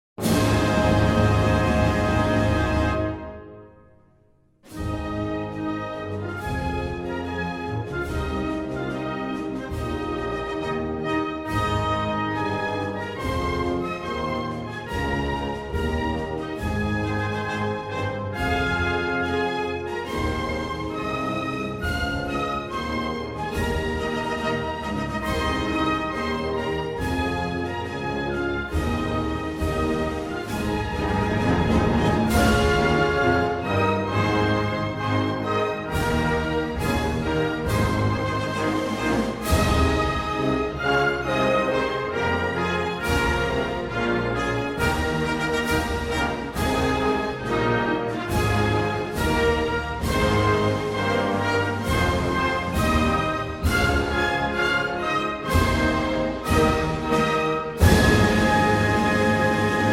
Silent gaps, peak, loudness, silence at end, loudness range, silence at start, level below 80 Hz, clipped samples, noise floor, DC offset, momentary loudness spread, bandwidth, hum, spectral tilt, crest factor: none; -4 dBFS; -24 LUFS; 0 s; 7 LU; 0.2 s; -36 dBFS; under 0.1%; -59 dBFS; under 0.1%; 8 LU; 16 kHz; none; -6 dB/octave; 20 dB